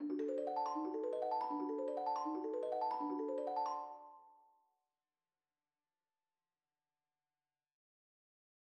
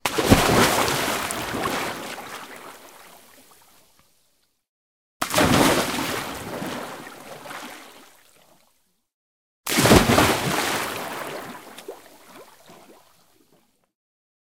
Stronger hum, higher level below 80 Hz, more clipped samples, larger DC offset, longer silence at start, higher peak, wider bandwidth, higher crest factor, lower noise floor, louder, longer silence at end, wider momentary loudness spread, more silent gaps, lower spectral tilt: neither; second, under -90 dBFS vs -42 dBFS; neither; second, under 0.1% vs 0.1%; about the same, 0 s vs 0.05 s; second, -30 dBFS vs 0 dBFS; second, 8.6 kHz vs 18 kHz; second, 14 dB vs 24 dB; first, under -90 dBFS vs -68 dBFS; second, -41 LUFS vs -21 LUFS; first, 4.4 s vs 1.75 s; second, 3 LU vs 23 LU; second, none vs 4.69-5.20 s, 9.14-9.64 s; first, -5.5 dB/octave vs -3.5 dB/octave